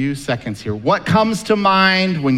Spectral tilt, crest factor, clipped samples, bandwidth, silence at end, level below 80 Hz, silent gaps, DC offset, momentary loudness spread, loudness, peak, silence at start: -5.5 dB/octave; 16 dB; under 0.1%; 13.5 kHz; 0 s; -48 dBFS; none; under 0.1%; 10 LU; -16 LUFS; 0 dBFS; 0 s